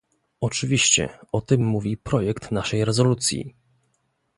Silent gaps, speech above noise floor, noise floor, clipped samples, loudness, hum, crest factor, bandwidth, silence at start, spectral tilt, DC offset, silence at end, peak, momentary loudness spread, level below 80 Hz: none; 48 dB; -71 dBFS; under 0.1%; -22 LUFS; none; 18 dB; 11.5 kHz; 0.4 s; -4 dB/octave; under 0.1%; 0.9 s; -6 dBFS; 11 LU; -48 dBFS